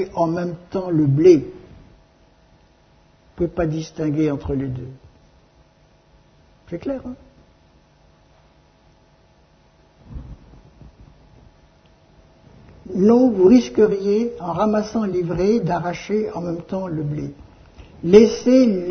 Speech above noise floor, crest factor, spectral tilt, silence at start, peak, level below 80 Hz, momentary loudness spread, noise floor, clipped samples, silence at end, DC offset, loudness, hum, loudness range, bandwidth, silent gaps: 37 dB; 20 dB; -7.5 dB/octave; 0 s; 0 dBFS; -46 dBFS; 19 LU; -55 dBFS; under 0.1%; 0 s; under 0.1%; -19 LUFS; none; 18 LU; 6.6 kHz; none